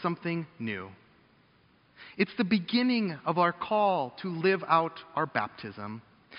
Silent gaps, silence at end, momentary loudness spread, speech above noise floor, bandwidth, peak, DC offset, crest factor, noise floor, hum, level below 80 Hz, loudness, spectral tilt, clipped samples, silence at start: none; 0 s; 14 LU; 34 dB; 5.4 kHz; -10 dBFS; under 0.1%; 22 dB; -64 dBFS; none; -72 dBFS; -29 LUFS; -4 dB/octave; under 0.1%; 0 s